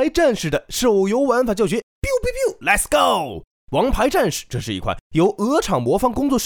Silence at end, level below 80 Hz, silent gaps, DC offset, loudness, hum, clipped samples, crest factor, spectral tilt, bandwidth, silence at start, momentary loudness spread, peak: 0 s; -34 dBFS; 1.83-2.02 s, 3.47-3.67 s, 5.01-5.10 s; under 0.1%; -19 LUFS; none; under 0.1%; 16 dB; -4.5 dB/octave; 19 kHz; 0 s; 8 LU; -2 dBFS